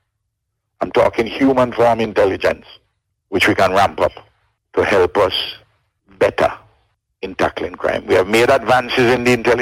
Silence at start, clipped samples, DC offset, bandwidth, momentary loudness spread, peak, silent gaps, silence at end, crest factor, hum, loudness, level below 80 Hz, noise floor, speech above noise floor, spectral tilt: 0.8 s; under 0.1%; under 0.1%; 16.5 kHz; 10 LU; -2 dBFS; none; 0 s; 14 dB; none; -16 LUFS; -46 dBFS; -74 dBFS; 59 dB; -5 dB/octave